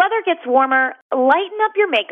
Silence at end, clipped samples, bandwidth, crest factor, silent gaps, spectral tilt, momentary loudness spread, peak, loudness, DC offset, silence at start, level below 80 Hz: 0.05 s; under 0.1%; 6 kHz; 14 dB; 1.01-1.10 s; -4 dB/octave; 5 LU; -4 dBFS; -17 LUFS; under 0.1%; 0 s; -82 dBFS